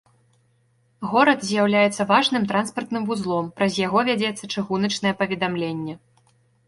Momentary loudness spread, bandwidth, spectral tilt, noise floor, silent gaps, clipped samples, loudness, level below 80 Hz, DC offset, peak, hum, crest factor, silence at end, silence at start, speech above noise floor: 10 LU; 11.5 kHz; -4.5 dB/octave; -63 dBFS; none; under 0.1%; -22 LUFS; -62 dBFS; under 0.1%; -4 dBFS; none; 20 dB; 0.7 s; 1 s; 42 dB